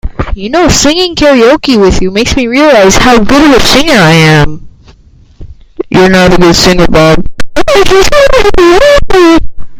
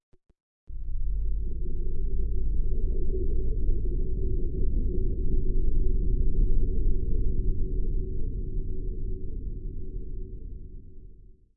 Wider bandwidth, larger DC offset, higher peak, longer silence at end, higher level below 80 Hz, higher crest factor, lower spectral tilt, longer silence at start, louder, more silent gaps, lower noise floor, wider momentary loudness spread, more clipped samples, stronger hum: first, 17 kHz vs 0.6 kHz; neither; first, 0 dBFS vs -12 dBFS; second, 0 s vs 0.4 s; first, -18 dBFS vs -26 dBFS; second, 4 dB vs 12 dB; second, -4.5 dB/octave vs -15.5 dB/octave; second, 0.05 s vs 0.7 s; first, -5 LUFS vs -33 LUFS; neither; second, -37 dBFS vs -49 dBFS; second, 7 LU vs 12 LU; first, 10% vs under 0.1%; neither